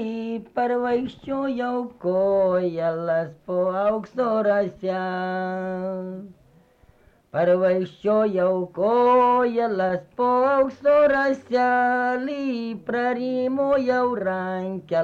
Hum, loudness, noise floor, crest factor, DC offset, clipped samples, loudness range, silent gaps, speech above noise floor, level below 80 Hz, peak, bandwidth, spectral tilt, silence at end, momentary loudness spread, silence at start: none; -23 LUFS; -56 dBFS; 12 dB; under 0.1%; under 0.1%; 6 LU; none; 34 dB; -60 dBFS; -10 dBFS; 7.2 kHz; -7.5 dB/octave; 0 s; 9 LU; 0 s